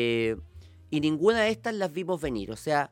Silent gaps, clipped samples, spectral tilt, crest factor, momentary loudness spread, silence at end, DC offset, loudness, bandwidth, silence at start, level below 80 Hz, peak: none; under 0.1%; -5.5 dB/octave; 18 dB; 10 LU; 0.05 s; under 0.1%; -28 LUFS; 16.5 kHz; 0 s; -52 dBFS; -10 dBFS